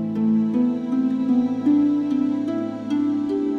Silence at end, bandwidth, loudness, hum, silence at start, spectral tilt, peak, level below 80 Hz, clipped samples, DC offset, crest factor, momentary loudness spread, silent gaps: 0 s; 6.4 kHz; -21 LUFS; none; 0 s; -8.5 dB/octave; -10 dBFS; -62 dBFS; under 0.1%; under 0.1%; 10 dB; 5 LU; none